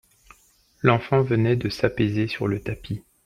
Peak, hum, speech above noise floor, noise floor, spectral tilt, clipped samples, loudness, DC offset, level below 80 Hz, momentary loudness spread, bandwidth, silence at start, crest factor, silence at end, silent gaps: -2 dBFS; none; 37 dB; -59 dBFS; -7.5 dB/octave; under 0.1%; -23 LUFS; under 0.1%; -50 dBFS; 10 LU; 13 kHz; 0.85 s; 22 dB; 0.25 s; none